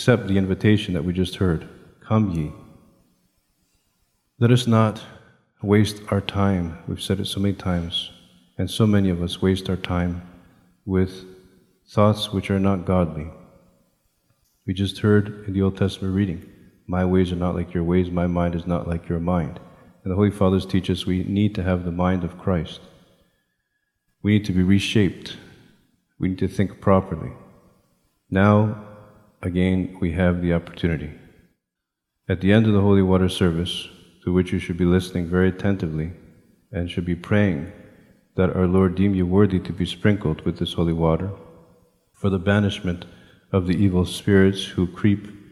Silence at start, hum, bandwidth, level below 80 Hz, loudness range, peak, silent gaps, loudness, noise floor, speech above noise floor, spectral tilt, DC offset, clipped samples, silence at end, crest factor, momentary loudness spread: 0 s; none; 12.5 kHz; -44 dBFS; 4 LU; -2 dBFS; none; -22 LUFS; -82 dBFS; 61 dB; -7 dB/octave; under 0.1%; under 0.1%; 0.15 s; 20 dB; 12 LU